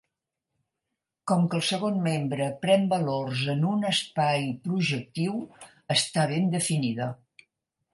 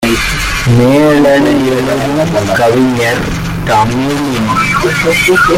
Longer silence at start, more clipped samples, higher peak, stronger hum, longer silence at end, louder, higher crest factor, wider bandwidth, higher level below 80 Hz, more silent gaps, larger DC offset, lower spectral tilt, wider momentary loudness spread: first, 1.25 s vs 0 s; neither; second, -10 dBFS vs 0 dBFS; neither; first, 0.8 s vs 0 s; second, -26 LUFS vs -10 LUFS; first, 18 dB vs 10 dB; second, 11.5 kHz vs 16.5 kHz; second, -70 dBFS vs -28 dBFS; neither; neither; about the same, -5 dB/octave vs -5 dB/octave; about the same, 7 LU vs 6 LU